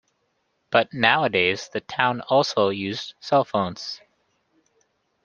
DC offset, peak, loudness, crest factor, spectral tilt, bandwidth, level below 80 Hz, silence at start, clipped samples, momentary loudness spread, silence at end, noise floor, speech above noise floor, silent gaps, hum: under 0.1%; 0 dBFS; -22 LUFS; 24 dB; -4.5 dB/octave; 7.4 kHz; -66 dBFS; 0.7 s; under 0.1%; 12 LU; 1.3 s; -71 dBFS; 49 dB; none; none